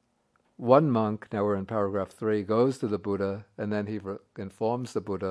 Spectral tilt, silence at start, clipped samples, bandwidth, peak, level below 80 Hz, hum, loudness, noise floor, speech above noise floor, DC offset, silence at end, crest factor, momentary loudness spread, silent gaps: -8 dB/octave; 0.6 s; under 0.1%; 11 kHz; -6 dBFS; -70 dBFS; none; -28 LUFS; -70 dBFS; 43 dB; under 0.1%; 0 s; 22 dB; 13 LU; none